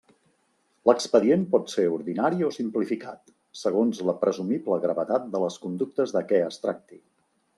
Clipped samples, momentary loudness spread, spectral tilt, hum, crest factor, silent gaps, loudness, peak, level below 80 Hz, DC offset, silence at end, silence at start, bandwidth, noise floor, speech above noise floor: under 0.1%; 10 LU; -6 dB/octave; none; 22 dB; none; -25 LUFS; -4 dBFS; -74 dBFS; under 0.1%; 0.65 s; 0.85 s; 12 kHz; -69 dBFS; 44 dB